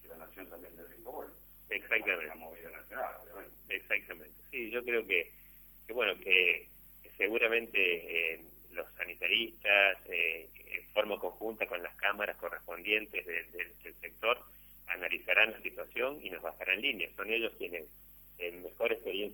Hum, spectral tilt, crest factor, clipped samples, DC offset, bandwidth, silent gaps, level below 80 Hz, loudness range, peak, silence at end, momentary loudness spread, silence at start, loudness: 50 Hz at -65 dBFS; -3 dB/octave; 24 dB; under 0.1%; under 0.1%; 19.5 kHz; none; -66 dBFS; 6 LU; -12 dBFS; 0 s; 21 LU; 0 s; -33 LUFS